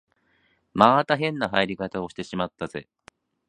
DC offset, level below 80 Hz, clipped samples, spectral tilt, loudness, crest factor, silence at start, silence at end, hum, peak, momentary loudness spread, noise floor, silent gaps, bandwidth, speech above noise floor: under 0.1%; -58 dBFS; under 0.1%; -6 dB/octave; -24 LUFS; 26 dB; 0.75 s; 0.65 s; none; 0 dBFS; 16 LU; -66 dBFS; none; 11 kHz; 43 dB